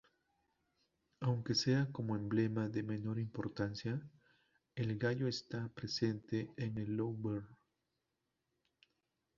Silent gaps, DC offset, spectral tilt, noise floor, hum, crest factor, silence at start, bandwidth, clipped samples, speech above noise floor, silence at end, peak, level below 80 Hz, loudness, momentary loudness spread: none; under 0.1%; -6 dB/octave; -87 dBFS; none; 18 dB; 1.2 s; 7.4 kHz; under 0.1%; 49 dB; 1.85 s; -22 dBFS; -70 dBFS; -39 LUFS; 8 LU